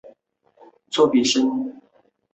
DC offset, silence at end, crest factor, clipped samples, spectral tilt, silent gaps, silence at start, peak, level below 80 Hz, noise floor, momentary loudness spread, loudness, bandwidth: under 0.1%; 0.6 s; 18 dB; under 0.1%; -3 dB/octave; none; 0.05 s; -4 dBFS; -66 dBFS; -61 dBFS; 12 LU; -20 LUFS; 8.2 kHz